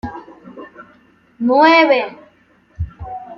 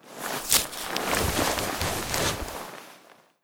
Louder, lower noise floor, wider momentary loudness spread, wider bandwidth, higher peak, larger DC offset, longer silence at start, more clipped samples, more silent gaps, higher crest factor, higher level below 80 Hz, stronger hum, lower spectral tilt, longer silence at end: first, -12 LUFS vs -26 LUFS; about the same, -53 dBFS vs -55 dBFS; first, 27 LU vs 14 LU; second, 7.2 kHz vs over 20 kHz; about the same, -2 dBFS vs 0 dBFS; neither; about the same, 0.05 s vs 0.05 s; neither; neither; second, 16 dB vs 30 dB; about the same, -42 dBFS vs -44 dBFS; neither; first, -6.5 dB/octave vs -2 dB/octave; second, 0.05 s vs 0.3 s